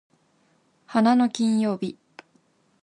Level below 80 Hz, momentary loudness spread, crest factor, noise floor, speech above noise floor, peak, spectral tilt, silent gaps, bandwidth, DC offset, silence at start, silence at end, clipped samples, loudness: -72 dBFS; 11 LU; 18 dB; -65 dBFS; 43 dB; -6 dBFS; -5.5 dB/octave; none; 10.5 kHz; under 0.1%; 0.9 s; 0.9 s; under 0.1%; -23 LUFS